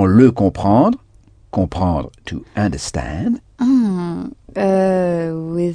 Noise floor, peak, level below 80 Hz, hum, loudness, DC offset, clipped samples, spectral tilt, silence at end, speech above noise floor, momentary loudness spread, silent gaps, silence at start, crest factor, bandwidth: -48 dBFS; 0 dBFS; -38 dBFS; none; -17 LUFS; under 0.1%; under 0.1%; -7.5 dB/octave; 0 s; 32 dB; 12 LU; none; 0 s; 16 dB; 10 kHz